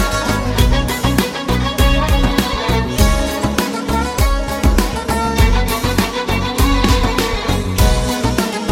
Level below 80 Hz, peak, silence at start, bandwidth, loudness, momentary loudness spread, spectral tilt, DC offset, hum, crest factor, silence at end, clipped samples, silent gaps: -18 dBFS; 0 dBFS; 0 s; 17 kHz; -16 LUFS; 4 LU; -5 dB/octave; under 0.1%; none; 14 dB; 0 s; under 0.1%; none